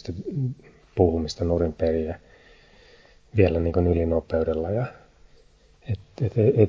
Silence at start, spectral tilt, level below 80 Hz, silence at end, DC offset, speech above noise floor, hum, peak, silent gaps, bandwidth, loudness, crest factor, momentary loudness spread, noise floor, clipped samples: 0.05 s; -8.5 dB/octave; -36 dBFS; 0 s; under 0.1%; 33 dB; none; -4 dBFS; none; 7.6 kHz; -25 LUFS; 22 dB; 12 LU; -55 dBFS; under 0.1%